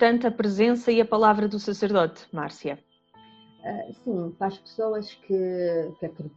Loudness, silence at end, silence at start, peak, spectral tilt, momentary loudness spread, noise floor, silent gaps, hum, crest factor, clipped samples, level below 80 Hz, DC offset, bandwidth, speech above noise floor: -25 LUFS; 0.1 s; 0 s; -4 dBFS; -6.5 dB/octave; 15 LU; -55 dBFS; none; none; 20 dB; under 0.1%; -66 dBFS; under 0.1%; 7.8 kHz; 30 dB